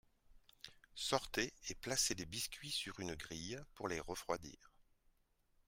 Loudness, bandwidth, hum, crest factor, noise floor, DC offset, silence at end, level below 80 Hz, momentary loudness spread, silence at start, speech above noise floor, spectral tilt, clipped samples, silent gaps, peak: -42 LUFS; 16 kHz; none; 26 dB; -77 dBFS; under 0.1%; 0.85 s; -64 dBFS; 17 LU; 0.3 s; 33 dB; -2 dB/octave; under 0.1%; none; -20 dBFS